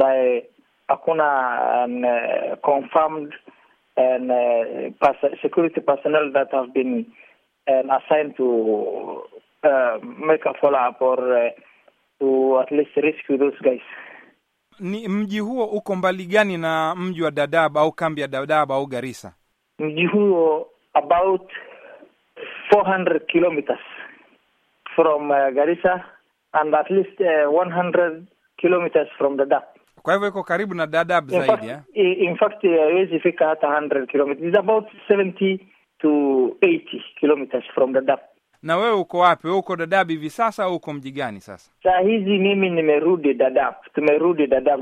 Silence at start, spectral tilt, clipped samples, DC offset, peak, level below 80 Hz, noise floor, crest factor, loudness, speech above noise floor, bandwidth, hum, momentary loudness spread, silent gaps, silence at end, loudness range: 0 s; -6.5 dB/octave; under 0.1%; under 0.1%; -2 dBFS; -64 dBFS; -64 dBFS; 18 dB; -20 LUFS; 45 dB; 11.5 kHz; none; 10 LU; none; 0 s; 3 LU